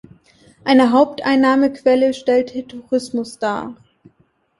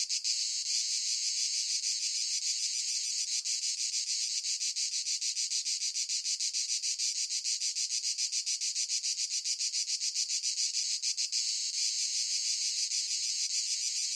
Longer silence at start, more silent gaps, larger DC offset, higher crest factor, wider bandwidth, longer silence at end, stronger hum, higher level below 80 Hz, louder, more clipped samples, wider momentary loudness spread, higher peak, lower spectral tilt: first, 0.65 s vs 0 s; neither; neither; about the same, 16 dB vs 16 dB; second, 11.5 kHz vs 16.5 kHz; first, 0.85 s vs 0 s; neither; first, -60 dBFS vs under -90 dBFS; first, -17 LUFS vs -30 LUFS; neither; first, 13 LU vs 1 LU; first, -2 dBFS vs -18 dBFS; first, -5 dB/octave vs 10 dB/octave